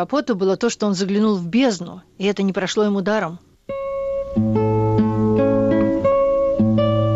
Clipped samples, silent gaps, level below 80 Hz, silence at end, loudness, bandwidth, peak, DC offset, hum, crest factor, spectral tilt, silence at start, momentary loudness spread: under 0.1%; none; -44 dBFS; 0 s; -19 LUFS; 8 kHz; -8 dBFS; under 0.1%; none; 10 dB; -6.5 dB/octave; 0 s; 8 LU